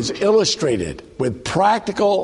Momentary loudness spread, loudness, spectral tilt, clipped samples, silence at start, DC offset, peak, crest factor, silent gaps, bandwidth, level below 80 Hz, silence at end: 9 LU; -19 LUFS; -4 dB/octave; under 0.1%; 0 s; under 0.1%; -2 dBFS; 16 dB; none; 11.5 kHz; -46 dBFS; 0 s